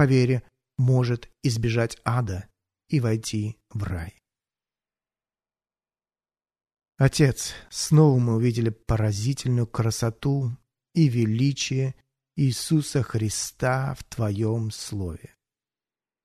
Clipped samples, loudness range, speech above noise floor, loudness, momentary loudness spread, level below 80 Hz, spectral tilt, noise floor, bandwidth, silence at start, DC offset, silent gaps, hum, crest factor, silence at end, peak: under 0.1%; 9 LU; over 67 dB; -25 LUFS; 12 LU; -48 dBFS; -6 dB/octave; under -90 dBFS; 13.5 kHz; 0 s; under 0.1%; none; none; 20 dB; 1.05 s; -6 dBFS